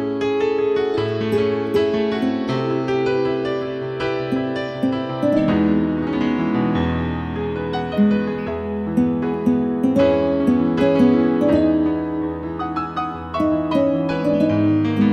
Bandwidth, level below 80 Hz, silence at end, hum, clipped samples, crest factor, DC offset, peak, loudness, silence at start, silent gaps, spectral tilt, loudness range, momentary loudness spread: 8.6 kHz; -44 dBFS; 0 s; none; under 0.1%; 14 dB; under 0.1%; -4 dBFS; -20 LUFS; 0 s; none; -8 dB/octave; 4 LU; 8 LU